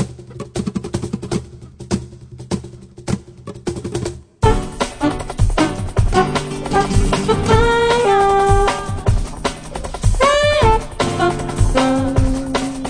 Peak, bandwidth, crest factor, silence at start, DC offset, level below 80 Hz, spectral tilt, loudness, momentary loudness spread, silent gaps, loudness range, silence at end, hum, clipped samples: 0 dBFS; 10.5 kHz; 16 dB; 0 s; under 0.1%; -24 dBFS; -5.5 dB/octave; -18 LUFS; 14 LU; none; 10 LU; 0 s; none; under 0.1%